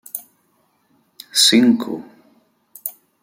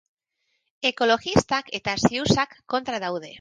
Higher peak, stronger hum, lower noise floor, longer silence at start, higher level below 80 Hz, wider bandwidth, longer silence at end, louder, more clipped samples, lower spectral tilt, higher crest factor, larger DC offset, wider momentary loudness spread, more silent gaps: about the same, -2 dBFS vs -4 dBFS; neither; second, -63 dBFS vs -75 dBFS; second, 0.15 s vs 0.8 s; second, -66 dBFS vs -50 dBFS; first, 16.5 kHz vs 10.5 kHz; first, 0.35 s vs 0 s; first, -15 LUFS vs -24 LUFS; neither; second, -2 dB/octave vs -4.5 dB/octave; about the same, 20 dB vs 20 dB; neither; first, 20 LU vs 8 LU; neither